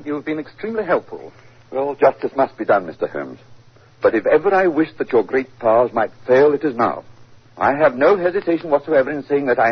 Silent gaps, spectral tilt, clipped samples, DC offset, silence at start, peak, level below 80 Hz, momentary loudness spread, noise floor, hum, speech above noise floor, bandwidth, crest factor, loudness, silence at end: none; -8 dB/octave; under 0.1%; 0.2%; 0 s; -2 dBFS; -58 dBFS; 11 LU; -46 dBFS; none; 29 dB; 6.4 kHz; 16 dB; -18 LUFS; 0 s